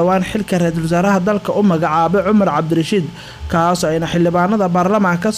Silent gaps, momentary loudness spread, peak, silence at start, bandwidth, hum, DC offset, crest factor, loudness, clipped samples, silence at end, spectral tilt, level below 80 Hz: none; 5 LU; -6 dBFS; 0 s; 15 kHz; none; under 0.1%; 8 dB; -15 LUFS; under 0.1%; 0 s; -6.5 dB/octave; -40 dBFS